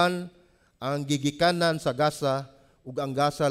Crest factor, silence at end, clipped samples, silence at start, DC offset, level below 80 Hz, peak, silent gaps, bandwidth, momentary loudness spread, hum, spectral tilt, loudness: 18 dB; 0 s; under 0.1%; 0 s; under 0.1%; -60 dBFS; -10 dBFS; none; 15.5 kHz; 13 LU; none; -5 dB/octave; -27 LUFS